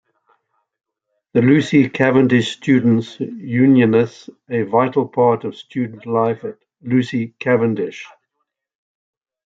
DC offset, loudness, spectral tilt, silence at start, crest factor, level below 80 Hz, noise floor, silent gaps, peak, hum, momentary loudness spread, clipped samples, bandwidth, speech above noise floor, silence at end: under 0.1%; -17 LUFS; -7.5 dB/octave; 1.35 s; 18 dB; -62 dBFS; -75 dBFS; none; 0 dBFS; none; 14 LU; under 0.1%; 7.8 kHz; 59 dB; 1.45 s